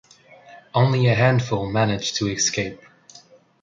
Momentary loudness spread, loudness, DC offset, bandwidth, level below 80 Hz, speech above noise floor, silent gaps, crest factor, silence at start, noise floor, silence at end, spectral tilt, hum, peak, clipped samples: 8 LU; -21 LUFS; under 0.1%; 7.6 kHz; -52 dBFS; 30 dB; none; 20 dB; 0.5 s; -50 dBFS; 0.45 s; -4.5 dB/octave; none; -4 dBFS; under 0.1%